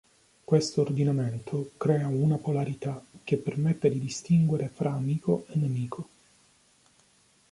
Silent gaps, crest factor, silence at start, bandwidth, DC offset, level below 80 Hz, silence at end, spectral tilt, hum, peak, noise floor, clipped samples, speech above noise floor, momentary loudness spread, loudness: none; 18 dB; 0.5 s; 11.5 kHz; under 0.1%; -64 dBFS; 1.5 s; -7.5 dB/octave; none; -10 dBFS; -64 dBFS; under 0.1%; 37 dB; 10 LU; -28 LUFS